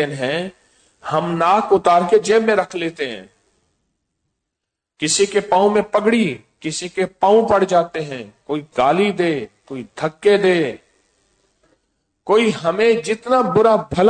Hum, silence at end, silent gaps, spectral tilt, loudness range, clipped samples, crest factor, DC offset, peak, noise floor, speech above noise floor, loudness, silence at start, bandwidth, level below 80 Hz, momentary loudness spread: none; 0 s; none; -4.5 dB/octave; 4 LU; under 0.1%; 14 dB; under 0.1%; -4 dBFS; -81 dBFS; 64 dB; -17 LUFS; 0 s; 9.4 kHz; -54 dBFS; 13 LU